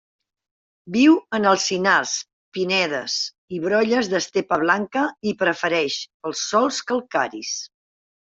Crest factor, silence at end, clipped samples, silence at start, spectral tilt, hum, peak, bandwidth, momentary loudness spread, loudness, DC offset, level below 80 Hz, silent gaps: 18 dB; 0.6 s; under 0.1%; 0.85 s; -3 dB/octave; none; -4 dBFS; 7.8 kHz; 10 LU; -21 LUFS; under 0.1%; -66 dBFS; 2.33-2.52 s, 3.38-3.48 s, 6.14-6.20 s